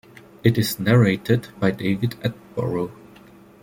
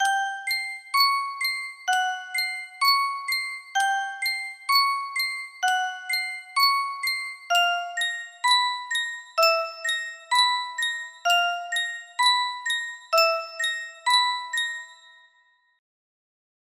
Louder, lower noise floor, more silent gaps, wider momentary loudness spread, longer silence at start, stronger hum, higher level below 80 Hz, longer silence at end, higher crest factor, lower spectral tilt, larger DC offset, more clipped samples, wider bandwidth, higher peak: about the same, -22 LUFS vs -24 LUFS; second, -47 dBFS vs -64 dBFS; neither; first, 11 LU vs 7 LU; first, 0.45 s vs 0 s; neither; first, -54 dBFS vs -80 dBFS; second, 0.7 s vs 1.8 s; about the same, 20 dB vs 18 dB; first, -6.5 dB/octave vs 4 dB/octave; neither; neither; about the same, 17 kHz vs 16 kHz; first, -2 dBFS vs -8 dBFS